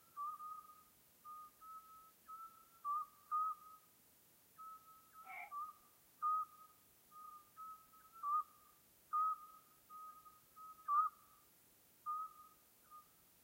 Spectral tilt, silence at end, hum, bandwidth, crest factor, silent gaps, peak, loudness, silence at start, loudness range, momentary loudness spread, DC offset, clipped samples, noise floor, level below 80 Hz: -1.5 dB/octave; 0.45 s; none; 16 kHz; 20 dB; none; -28 dBFS; -45 LUFS; 0.15 s; 4 LU; 26 LU; under 0.1%; under 0.1%; -70 dBFS; under -90 dBFS